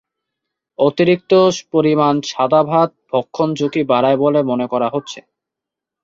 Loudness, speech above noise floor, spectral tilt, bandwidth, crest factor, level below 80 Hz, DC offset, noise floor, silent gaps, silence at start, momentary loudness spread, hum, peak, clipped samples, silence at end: -16 LUFS; 69 dB; -6 dB/octave; 7.8 kHz; 16 dB; -60 dBFS; under 0.1%; -84 dBFS; none; 0.8 s; 8 LU; none; -2 dBFS; under 0.1%; 0.85 s